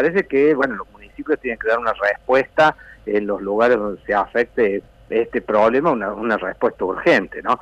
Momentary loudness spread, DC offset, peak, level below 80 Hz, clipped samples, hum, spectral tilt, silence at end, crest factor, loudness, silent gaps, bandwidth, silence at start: 7 LU; under 0.1%; -4 dBFS; -50 dBFS; under 0.1%; none; -6.5 dB/octave; 0.05 s; 14 dB; -19 LUFS; none; 9 kHz; 0 s